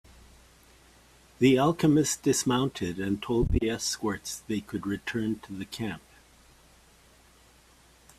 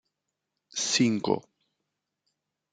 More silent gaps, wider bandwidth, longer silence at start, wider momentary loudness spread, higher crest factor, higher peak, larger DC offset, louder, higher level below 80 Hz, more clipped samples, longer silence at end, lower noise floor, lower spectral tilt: neither; first, 15.5 kHz vs 9.6 kHz; first, 1.4 s vs 0.75 s; first, 13 LU vs 8 LU; about the same, 20 dB vs 22 dB; about the same, -10 dBFS vs -10 dBFS; neither; about the same, -28 LUFS vs -27 LUFS; first, -44 dBFS vs -76 dBFS; neither; first, 2.2 s vs 1.35 s; second, -58 dBFS vs -84 dBFS; first, -5 dB/octave vs -3.5 dB/octave